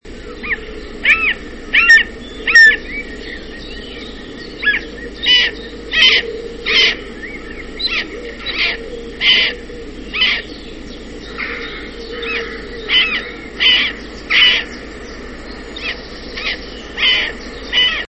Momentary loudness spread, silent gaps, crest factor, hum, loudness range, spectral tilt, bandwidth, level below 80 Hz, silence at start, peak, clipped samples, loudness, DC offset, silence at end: 21 LU; none; 18 dB; none; 7 LU; -2 dB/octave; 8.6 kHz; -36 dBFS; 0.05 s; 0 dBFS; under 0.1%; -13 LUFS; 0.4%; 0.05 s